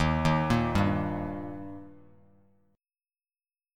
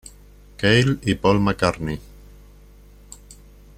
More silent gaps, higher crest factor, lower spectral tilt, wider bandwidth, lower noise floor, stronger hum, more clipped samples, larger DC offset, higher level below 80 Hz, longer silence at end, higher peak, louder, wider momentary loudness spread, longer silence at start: neither; about the same, 18 dB vs 20 dB; about the same, -7 dB/octave vs -6 dB/octave; second, 14 kHz vs 15.5 kHz; first, under -90 dBFS vs -47 dBFS; second, none vs 50 Hz at -40 dBFS; neither; neither; about the same, -44 dBFS vs -42 dBFS; about the same, 1.8 s vs 1.8 s; second, -12 dBFS vs -2 dBFS; second, -28 LUFS vs -20 LUFS; about the same, 17 LU vs 19 LU; second, 0 s vs 0.6 s